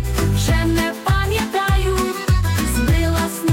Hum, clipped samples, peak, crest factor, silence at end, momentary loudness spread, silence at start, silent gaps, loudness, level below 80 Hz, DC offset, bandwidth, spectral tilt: none; under 0.1%; -6 dBFS; 12 dB; 0 s; 2 LU; 0 s; none; -19 LUFS; -24 dBFS; under 0.1%; 17 kHz; -5 dB/octave